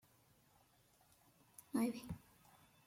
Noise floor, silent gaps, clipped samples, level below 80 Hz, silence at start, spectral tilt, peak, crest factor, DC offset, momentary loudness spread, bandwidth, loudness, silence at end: -73 dBFS; none; under 0.1%; -74 dBFS; 1.75 s; -5.5 dB/octave; -28 dBFS; 20 dB; under 0.1%; 22 LU; 16.5 kHz; -44 LUFS; 0.7 s